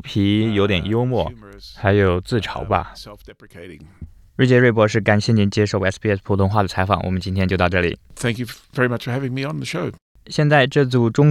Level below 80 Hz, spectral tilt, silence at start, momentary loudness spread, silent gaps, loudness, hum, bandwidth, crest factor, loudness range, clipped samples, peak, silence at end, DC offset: -46 dBFS; -6.5 dB/octave; 0.05 s; 13 LU; 10.01-10.15 s; -19 LUFS; none; 13 kHz; 18 dB; 4 LU; under 0.1%; -2 dBFS; 0 s; under 0.1%